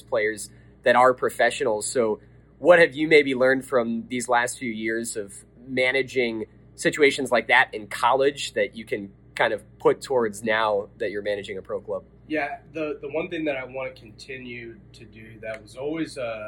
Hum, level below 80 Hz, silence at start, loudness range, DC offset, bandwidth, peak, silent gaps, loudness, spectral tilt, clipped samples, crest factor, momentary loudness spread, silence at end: none; -58 dBFS; 0.1 s; 11 LU; under 0.1%; 17.5 kHz; -4 dBFS; none; -23 LUFS; -3.5 dB/octave; under 0.1%; 22 dB; 18 LU; 0 s